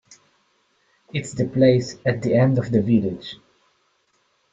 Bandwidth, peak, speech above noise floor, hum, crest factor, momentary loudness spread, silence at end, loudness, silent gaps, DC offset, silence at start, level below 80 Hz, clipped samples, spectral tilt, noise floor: 8 kHz; -4 dBFS; 46 dB; none; 20 dB; 15 LU; 1.2 s; -20 LUFS; none; under 0.1%; 1.15 s; -56 dBFS; under 0.1%; -7.5 dB/octave; -66 dBFS